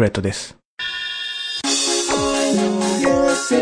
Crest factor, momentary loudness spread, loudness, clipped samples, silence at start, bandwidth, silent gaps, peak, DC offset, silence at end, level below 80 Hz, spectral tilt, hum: 16 dB; 9 LU; -19 LUFS; under 0.1%; 0 s; 10.5 kHz; 0.65-0.77 s; -4 dBFS; under 0.1%; 0 s; -46 dBFS; -3.5 dB/octave; none